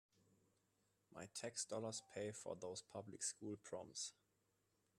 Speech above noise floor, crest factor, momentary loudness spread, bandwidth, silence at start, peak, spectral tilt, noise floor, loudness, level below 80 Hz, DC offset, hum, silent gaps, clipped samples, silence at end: 34 dB; 20 dB; 7 LU; 13.5 kHz; 1.1 s; -32 dBFS; -3 dB/octave; -85 dBFS; -50 LUFS; -90 dBFS; under 0.1%; none; none; under 0.1%; 0.85 s